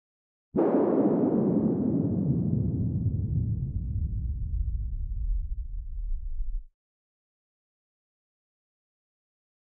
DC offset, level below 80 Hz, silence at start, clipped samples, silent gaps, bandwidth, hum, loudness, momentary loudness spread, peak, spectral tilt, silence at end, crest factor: under 0.1%; -36 dBFS; 0.55 s; under 0.1%; none; 2.8 kHz; none; -28 LUFS; 15 LU; -14 dBFS; -13.5 dB/octave; 3.05 s; 16 dB